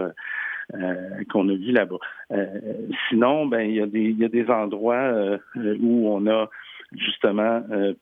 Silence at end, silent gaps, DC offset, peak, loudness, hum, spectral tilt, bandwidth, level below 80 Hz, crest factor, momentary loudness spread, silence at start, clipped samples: 0.05 s; none; under 0.1%; -6 dBFS; -23 LUFS; none; -8.5 dB/octave; 3.9 kHz; -76 dBFS; 18 dB; 9 LU; 0 s; under 0.1%